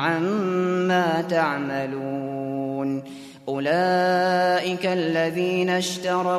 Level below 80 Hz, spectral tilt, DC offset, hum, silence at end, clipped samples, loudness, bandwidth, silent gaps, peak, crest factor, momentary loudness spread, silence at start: -68 dBFS; -5.5 dB/octave; under 0.1%; none; 0 s; under 0.1%; -23 LUFS; 14 kHz; none; -8 dBFS; 16 dB; 9 LU; 0 s